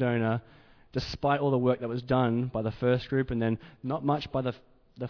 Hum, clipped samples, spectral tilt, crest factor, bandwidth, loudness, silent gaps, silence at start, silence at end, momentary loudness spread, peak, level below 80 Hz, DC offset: none; under 0.1%; -8 dB/octave; 16 dB; 5.4 kHz; -29 LUFS; none; 0 s; 0 s; 9 LU; -12 dBFS; -52 dBFS; under 0.1%